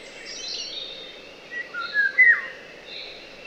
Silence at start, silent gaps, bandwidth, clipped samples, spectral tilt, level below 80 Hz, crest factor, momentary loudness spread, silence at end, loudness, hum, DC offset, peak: 0 s; none; 9 kHz; under 0.1%; 0 dB/octave; -62 dBFS; 20 dB; 22 LU; 0 s; -21 LUFS; none; under 0.1%; -6 dBFS